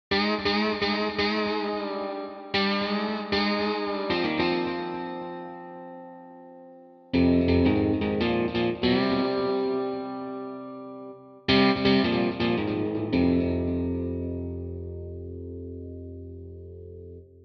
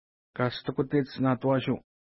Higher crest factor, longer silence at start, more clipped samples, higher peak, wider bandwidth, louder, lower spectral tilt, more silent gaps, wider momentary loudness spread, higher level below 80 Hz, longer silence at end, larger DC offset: about the same, 18 dB vs 16 dB; second, 0.1 s vs 0.35 s; neither; about the same, -10 dBFS vs -12 dBFS; first, 6.4 kHz vs 5.8 kHz; first, -26 LUFS vs -29 LUFS; second, -7.5 dB/octave vs -11 dB/octave; neither; first, 20 LU vs 7 LU; first, -48 dBFS vs -62 dBFS; second, 0.05 s vs 0.35 s; neither